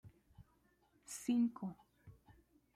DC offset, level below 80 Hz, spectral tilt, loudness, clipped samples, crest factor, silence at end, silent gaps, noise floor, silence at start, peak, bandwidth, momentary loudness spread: under 0.1%; -74 dBFS; -5 dB/octave; -40 LUFS; under 0.1%; 18 dB; 0.65 s; none; -75 dBFS; 0.05 s; -26 dBFS; 14.5 kHz; 25 LU